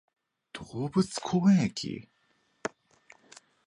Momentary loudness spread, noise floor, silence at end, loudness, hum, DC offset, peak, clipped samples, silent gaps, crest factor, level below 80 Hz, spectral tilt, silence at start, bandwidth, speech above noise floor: 19 LU; -71 dBFS; 1 s; -29 LUFS; none; under 0.1%; -14 dBFS; under 0.1%; none; 18 dB; -64 dBFS; -6 dB/octave; 0.55 s; 11 kHz; 44 dB